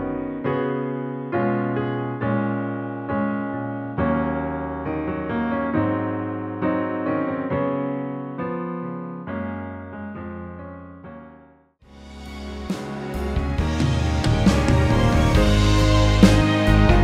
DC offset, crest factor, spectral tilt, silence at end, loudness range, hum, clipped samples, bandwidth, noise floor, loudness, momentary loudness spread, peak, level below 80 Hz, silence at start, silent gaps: under 0.1%; 20 dB; -6.5 dB/octave; 0 s; 15 LU; none; under 0.1%; 13.5 kHz; -52 dBFS; -22 LUFS; 17 LU; -2 dBFS; -28 dBFS; 0 s; none